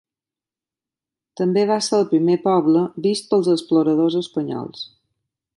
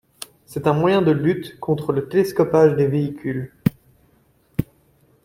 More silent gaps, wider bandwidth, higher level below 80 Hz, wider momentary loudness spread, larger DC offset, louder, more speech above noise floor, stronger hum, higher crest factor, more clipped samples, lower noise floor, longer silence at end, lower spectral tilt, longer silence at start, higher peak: neither; second, 11.5 kHz vs 16.5 kHz; second, -70 dBFS vs -50 dBFS; about the same, 11 LU vs 13 LU; neither; about the same, -19 LUFS vs -20 LUFS; first, over 72 dB vs 40 dB; neither; about the same, 14 dB vs 18 dB; neither; first, under -90 dBFS vs -59 dBFS; about the same, 0.7 s vs 0.6 s; second, -6 dB/octave vs -7.5 dB/octave; first, 1.4 s vs 0.5 s; second, -6 dBFS vs -2 dBFS